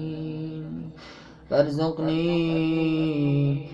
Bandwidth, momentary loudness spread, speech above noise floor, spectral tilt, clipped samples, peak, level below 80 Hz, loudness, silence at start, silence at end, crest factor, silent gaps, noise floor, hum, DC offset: 7.6 kHz; 14 LU; 22 dB; -8.5 dB/octave; under 0.1%; -8 dBFS; -54 dBFS; -25 LUFS; 0 s; 0 s; 18 dB; none; -45 dBFS; none; under 0.1%